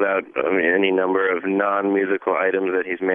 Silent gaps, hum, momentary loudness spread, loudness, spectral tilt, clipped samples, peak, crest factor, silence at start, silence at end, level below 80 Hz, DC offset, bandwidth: none; none; 4 LU; -20 LUFS; -9 dB/octave; under 0.1%; -4 dBFS; 16 dB; 0 s; 0 s; -70 dBFS; under 0.1%; 3.7 kHz